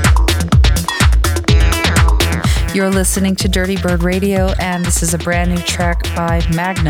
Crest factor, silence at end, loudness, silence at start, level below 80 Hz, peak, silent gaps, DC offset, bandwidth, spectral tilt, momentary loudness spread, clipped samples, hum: 12 dB; 0 s; -14 LUFS; 0 s; -16 dBFS; -2 dBFS; none; under 0.1%; 17 kHz; -4.5 dB/octave; 4 LU; under 0.1%; none